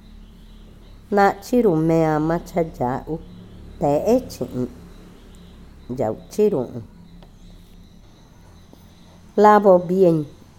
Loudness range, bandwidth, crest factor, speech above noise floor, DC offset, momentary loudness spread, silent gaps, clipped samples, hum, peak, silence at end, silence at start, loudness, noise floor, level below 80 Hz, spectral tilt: 8 LU; 16.5 kHz; 20 dB; 28 dB; under 0.1%; 16 LU; none; under 0.1%; none; -2 dBFS; 0.3 s; 0.15 s; -19 LUFS; -47 dBFS; -46 dBFS; -7.5 dB/octave